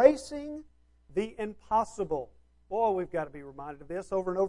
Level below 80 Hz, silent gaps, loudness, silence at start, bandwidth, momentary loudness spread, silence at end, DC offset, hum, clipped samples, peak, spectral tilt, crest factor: -58 dBFS; none; -32 LUFS; 0 s; 11.5 kHz; 14 LU; 0 s; under 0.1%; none; under 0.1%; -6 dBFS; -6 dB/octave; 24 dB